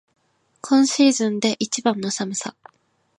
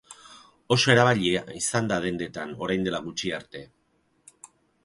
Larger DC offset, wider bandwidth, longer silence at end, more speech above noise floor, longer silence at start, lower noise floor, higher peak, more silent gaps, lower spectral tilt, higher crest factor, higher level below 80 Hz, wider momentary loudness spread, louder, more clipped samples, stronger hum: neither; about the same, 11 kHz vs 11.5 kHz; first, 0.7 s vs 0.4 s; about the same, 43 dB vs 44 dB; first, 0.65 s vs 0.1 s; second, -62 dBFS vs -69 dBFS; about the same, -4 dBFS vs -2 dBFS; neither; about the same, -3.5 dB/octave vs -4 dB/octave; second, 18 dB vs 24 dB; second, -72 dBFS vs -58 dBFS; second, 12 LU vs 22 LU; first, -20 LUFS vs -25 LUFS; neither; neither